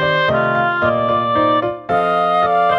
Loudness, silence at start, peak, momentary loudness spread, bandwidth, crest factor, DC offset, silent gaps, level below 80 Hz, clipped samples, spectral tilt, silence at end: -16 LUFS; 0 s; -4 dBFS; 3 LU; 7.2 kHz; 12 dB; under 0.1%; none; -48 dBFS; under 0.1%; -7 dB/octave; 0 s